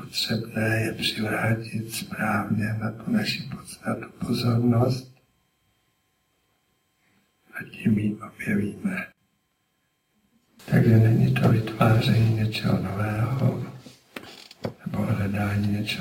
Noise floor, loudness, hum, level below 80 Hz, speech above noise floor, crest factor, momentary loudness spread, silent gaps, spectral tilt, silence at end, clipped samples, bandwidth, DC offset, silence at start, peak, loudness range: -72 dBFS; -25 LUFS; none; -52 dBFS; 48 dB; 18 dB; 16 LU; none; -6.5 dB/octave; 0 s; under 0.1%; 16.5 kHz; under 0.1%; 0 s; -6 dBFS; 9 LU